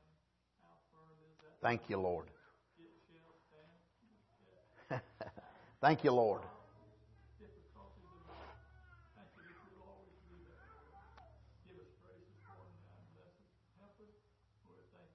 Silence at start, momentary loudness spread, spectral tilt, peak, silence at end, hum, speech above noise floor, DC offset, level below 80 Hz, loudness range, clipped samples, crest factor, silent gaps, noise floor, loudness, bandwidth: 1.65 s; 30 LU; -5 dB/octave; -16 dBFS; 2.6 s; none; 43 dB; under 0.1%; -70 dBFS; 24 LU; under 0.1%; 28 dB; none; -77 dBFS; -37 LUFS; 6 kHz